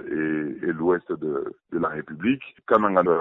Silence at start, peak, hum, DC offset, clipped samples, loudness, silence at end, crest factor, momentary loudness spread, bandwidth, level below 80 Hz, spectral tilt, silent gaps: 0 s; -4 dBFS; none; under 0.1%; under 0.1%; -25 LUFS; 0 s; 20 dB; 9 LU; 4 kHz; -62 dBFS; -9.5 dB/octave; none